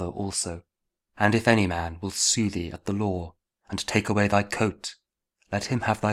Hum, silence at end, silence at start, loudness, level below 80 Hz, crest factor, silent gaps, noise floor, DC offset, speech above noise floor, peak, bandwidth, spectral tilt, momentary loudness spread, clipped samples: none; 0 s; 0 s; -26 LUFS; -50 dBFS; 22 dB; none; -72 dBFS; under 0.1%; 47 dB; -4 dBFS; 15 kHz; -4 dB/octave; 12 LU; under 0.1%